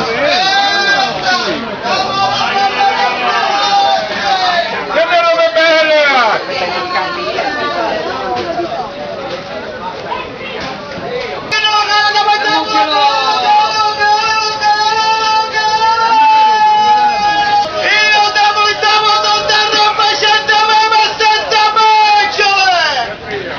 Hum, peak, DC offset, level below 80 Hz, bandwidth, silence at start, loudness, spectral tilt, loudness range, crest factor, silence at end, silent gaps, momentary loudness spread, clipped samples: none; 0 dBFS; under 0.1%; -48 dBFS; 7.2 kHz; 0 s; -11 LUFS; -2 dB/octave; 8 LU; 12 dB; 0 s; none; 12 LU; under 0.1%